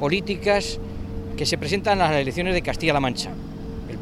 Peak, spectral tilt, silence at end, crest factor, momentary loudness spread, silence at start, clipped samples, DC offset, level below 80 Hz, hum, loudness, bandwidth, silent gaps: -6 dBFS; -5 dB/octave; 0 s; 18 dB; 13 LU; 0 s; under 0.1%; under 0.1%; -36 dBFS; none; -23 LUFS; 15.5 kHz; none